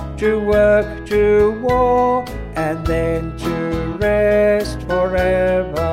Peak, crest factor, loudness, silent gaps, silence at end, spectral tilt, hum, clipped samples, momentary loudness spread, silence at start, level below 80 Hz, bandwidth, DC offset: -2 dBFS; 14 dB; -17 LUFS; none; 0 s; -7 dB/octave; none; under 0.1%; 8 LU; 0 s; -30 dBFS; 15.5 kHz; under 0.1%